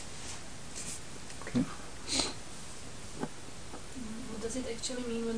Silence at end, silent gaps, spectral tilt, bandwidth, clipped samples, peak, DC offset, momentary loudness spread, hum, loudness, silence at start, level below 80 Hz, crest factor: 0 s; none; -3 dB/octave; 10.5 kHz; under 0.1%; -14 dBFS; 0.7%; 13 LU; none; -38 LUFS; 0 s; -54 dBFS; 24 dB